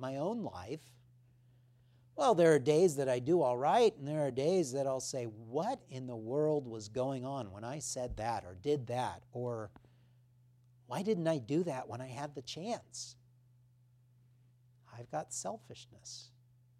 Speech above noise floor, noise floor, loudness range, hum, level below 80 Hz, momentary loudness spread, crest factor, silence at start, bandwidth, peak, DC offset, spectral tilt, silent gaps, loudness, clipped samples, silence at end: 32 dB; -67 dBFS; 16 LU; none; -66 dBFS; 17 LU; 22 dB; 0 s; 14.5 kHz; -14 dBFS; under 0.1%; -5.5 dB/octave; none; -35 LUFS; under 0.1%; 0.55 s